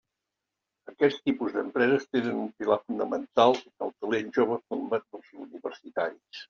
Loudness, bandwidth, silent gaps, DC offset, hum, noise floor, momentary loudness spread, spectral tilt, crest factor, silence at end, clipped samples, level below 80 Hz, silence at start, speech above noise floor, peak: -28 LUFS; 7.2 kHz; none; under 0.1%; none; -86 dBFS; 15 LU; -3.5 dB/octave; 22 dB; 0.05 s; under 0.1%; -74 dBFS; 0.9 s; 58 dB; -8 dBFS